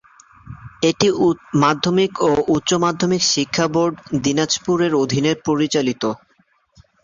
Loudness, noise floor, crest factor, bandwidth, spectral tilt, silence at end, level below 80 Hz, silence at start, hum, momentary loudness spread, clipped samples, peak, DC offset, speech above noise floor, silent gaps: -18 LUFS; -60 dBFS; 16 dB; 7.6 kHz; -4.5 dB/octave; 0.85 s; -52 dBFS; 0.45 s; none; 5 LU; under 0.1%; -2 dBFS; under 0.1%; 43 dB; none